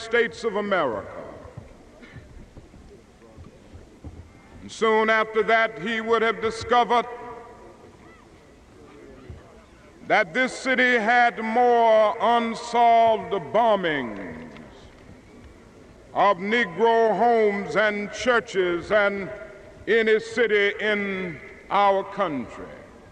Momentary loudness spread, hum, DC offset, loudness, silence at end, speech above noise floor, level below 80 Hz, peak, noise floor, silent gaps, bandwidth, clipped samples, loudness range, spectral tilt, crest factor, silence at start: 19 LU; none; under 0.1%; -22 LUFS; 0.25 s; 29 dB; -54 dBFS; -6 dBFS; -50 dBFS; none; 10 kHz; under 0.1%; 9 LU; -4.5 dB/octave; 18 dB; 0 s